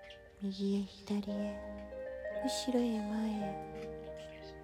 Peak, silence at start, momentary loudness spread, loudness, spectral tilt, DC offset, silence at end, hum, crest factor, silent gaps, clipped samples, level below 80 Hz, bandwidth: -20 dBFS; 0 s; 13 LU; -38 LUFS; -5.5 dB/octave; under 0.1%; 0 s; none; 18 dB; none; under 0.1%; -60 dBFS; 14.5 kHz